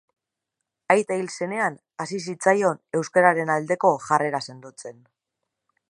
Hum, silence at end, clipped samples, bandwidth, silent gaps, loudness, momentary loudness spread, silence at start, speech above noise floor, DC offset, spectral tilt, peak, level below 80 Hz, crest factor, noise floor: none; 0.95 s; under 0.1%; 11.5 kHz; none; -23 LUFS; 18 LU; 0.9 s; 60 dB; under 0.1%; -5 dB/octave; -2 dBFS; -76 dBFS; 22 dB; -83 dBFS